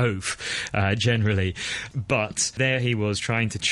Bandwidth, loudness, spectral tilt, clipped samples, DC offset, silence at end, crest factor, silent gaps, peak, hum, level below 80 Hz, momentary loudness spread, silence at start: 11.5 kHz; -24 LUFS; -4 dB/octave; under 0.1%; under 0.1%; 0 s; 16 dB; none; -8 dBFS; none; -50 dBFS; 6 LU; 0 s